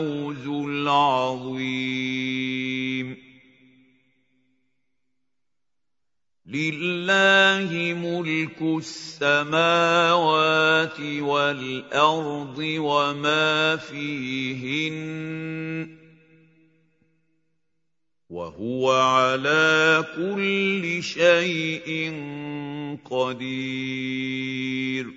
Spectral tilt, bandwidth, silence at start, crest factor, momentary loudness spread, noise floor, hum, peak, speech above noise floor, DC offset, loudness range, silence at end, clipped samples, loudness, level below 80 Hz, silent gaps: -4.5 dB/octave; 8 kHz; 0 s; 20 dB; 13 LU; -87 dBFS; none; -4 dBFS; 64 dB; under 0.1%; 12 LU; 0 s; under 0.1%; -23 LUFS; -70 dBFS; none